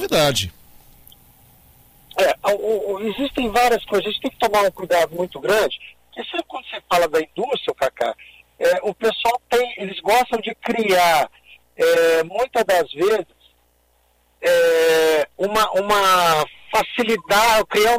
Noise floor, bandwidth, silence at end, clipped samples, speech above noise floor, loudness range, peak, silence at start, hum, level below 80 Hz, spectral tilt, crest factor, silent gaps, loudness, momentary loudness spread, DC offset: -61 dBFS; 16 kHz; 0 s; under 0.1%; 42 dB; 5 LU; -6 dBFS; 0 s; 60 Hz at -60 dBFS; -50 dBFS; -3 dB/octave; 14 dB; none; -19 LUFS; 10 LU; under 0.1%